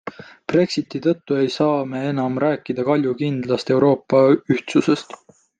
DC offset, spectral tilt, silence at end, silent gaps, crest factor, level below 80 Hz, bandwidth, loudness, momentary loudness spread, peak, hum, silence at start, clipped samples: under 0.1%; -7 dB/octave; 0.55 s; none; 16 dB; -64 dBFS; 9.2 kHz; -19 LUFS; 7 LU; -2 dBFS; none; 0.05 s; under 0.1%